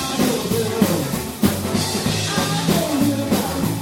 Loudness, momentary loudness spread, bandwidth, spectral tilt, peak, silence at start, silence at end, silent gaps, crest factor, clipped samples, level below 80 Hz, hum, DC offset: -20 LUFS; 2 LU; 19.5 kHz; -4.5 dB/octave; -2 dBFS; 0 s; 0 s; none; 18 dB; under 0.1%; -42 dBFS; none; under 0.1%